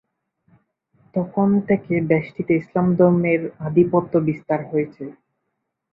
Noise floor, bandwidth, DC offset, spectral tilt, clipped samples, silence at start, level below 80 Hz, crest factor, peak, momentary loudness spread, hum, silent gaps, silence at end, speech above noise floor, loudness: -77 dBFS; 4.1 kHz; under 0.1%; -12 dB/octave; under 0.1%; 1.15 s; -58 dBFS; 18 dB; -4 dBFS; 10 LU; none; none; 0.8 s; 58 dB; -20 LUFS